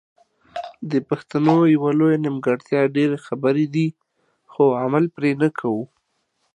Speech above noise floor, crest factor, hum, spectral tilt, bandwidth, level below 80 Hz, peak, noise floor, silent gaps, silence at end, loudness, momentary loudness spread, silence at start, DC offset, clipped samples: 51 dB; 20 dB; none; -8.5 dB/octave; 9.2 kHz; -68 dBFS; -2 dBFS; -70 dBFS; none; 0.7 s; -20 LUFS; 14 LU; 0.55 s; under 0.1%; under 0.1%